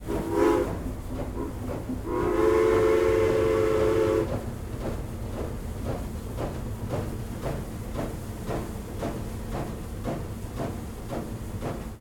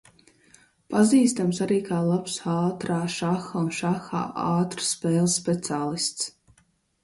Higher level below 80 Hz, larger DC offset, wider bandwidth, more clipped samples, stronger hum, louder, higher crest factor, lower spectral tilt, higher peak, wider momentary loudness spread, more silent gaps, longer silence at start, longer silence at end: first, -38 dBFS vs -64 dBFS; neither; first, 17.5 kHz vs 11.5 kHz; neither; neither; second, -29 LUFS vs -25 LUFS; about the same, 18 dB vs 18 dB; first, -7 dB/octave vs -5 dB/octave; about the same, -10 dBFS vs -8 dBFS; first, 13 LU vs 8 LU; neither; second, 0 s vs 0.9 s; second, 0 s vs 0.75 s